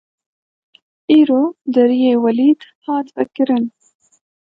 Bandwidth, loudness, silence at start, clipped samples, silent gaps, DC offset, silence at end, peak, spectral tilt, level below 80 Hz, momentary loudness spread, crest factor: 5.2 kHz; -15 LUFS; 1.1 s; under 0.1%; 2.75-2.82 s; under 0.1%; 0.9 s; -2 dBFS; -7.5 dB/octave; -70 dBFS; 10 LU; 16 dB